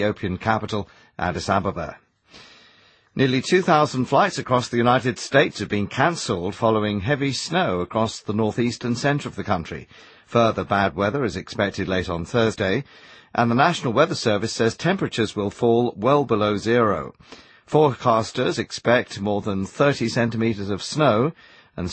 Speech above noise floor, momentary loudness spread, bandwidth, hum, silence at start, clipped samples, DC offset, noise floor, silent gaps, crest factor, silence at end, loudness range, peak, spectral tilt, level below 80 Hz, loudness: 34 dB; 8 LU; 8.8 kHz; none; 0 s; under 0.1%; under 0.1%; -55 dBFS; none; 18 dB; 0 s; 3 LU; -4 dBFS; -5.5 dB/octave; -52 dBFS; -22 LUFS